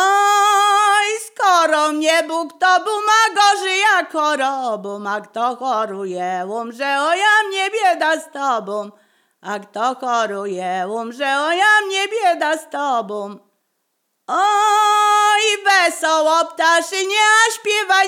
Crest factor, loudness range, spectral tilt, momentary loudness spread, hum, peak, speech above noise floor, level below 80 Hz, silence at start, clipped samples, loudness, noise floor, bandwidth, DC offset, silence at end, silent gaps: 14 dB; 6 LU; -1 dB/octave; 11 LU; none; -2 dBFS; 54 dB; -84 dBFS; 0 s; under 0.1%; -16 LUFS; -71 dBFS; 16.5 kHz; under 0.1%; 0 s; none